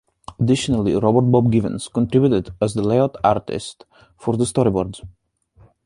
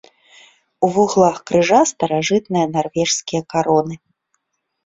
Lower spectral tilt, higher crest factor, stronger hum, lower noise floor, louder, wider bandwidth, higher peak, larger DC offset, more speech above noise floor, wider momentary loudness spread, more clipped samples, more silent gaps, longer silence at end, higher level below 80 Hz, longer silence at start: first, -7 dB/octave vs -4.5 dB/octave; about the same, 18 dB vs 18 dB; neither; second, -53 dBFS vs -70 dBFS; about the same, -19 LUFS vs -17 LUFS; first, 11.5 kHz vs 8.2 kHz; about the same, -2 dBFS vs 0 dBFS; neither; second, 35 dB vs 54 dB; first, 13 LU vs 6 LU; neither; neither; second, 0.75 s vs 0.9 s; first, -44 dBFS vs -56 dBFS; second, 0.3 s vs 0.8 s